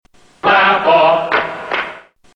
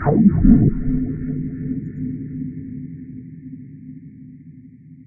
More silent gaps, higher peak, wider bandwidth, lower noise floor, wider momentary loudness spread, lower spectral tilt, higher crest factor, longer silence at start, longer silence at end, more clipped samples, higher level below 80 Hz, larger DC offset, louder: neither; about the same, 0 dBFS vs 0 dBFS; first, 8 kHz vs 2.4 kHz; second, -34 dBFS vs -42 dBFS; second, 10 LU vs 25 LU; second, -5 dB/octave vs -15.5 dB/octave; second, 14 dB vs 20 dB; first, 0.45 s vs 0 s; first, 0.35 s vs 0.1 s; neither; second, -54 dBFS vs -30 dBFS; neither; first, -13 LUFS vs -19 LUFS